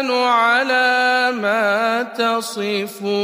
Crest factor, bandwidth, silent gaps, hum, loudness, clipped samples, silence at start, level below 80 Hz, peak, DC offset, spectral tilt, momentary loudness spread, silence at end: 14 dB; 15.5 kHz; none; none; -17 LUFS; under 0.1%; 0 s; -76 dBFS; -4 dBFS; under 0.1%; -3 dB/octave; 7 LU; 0 s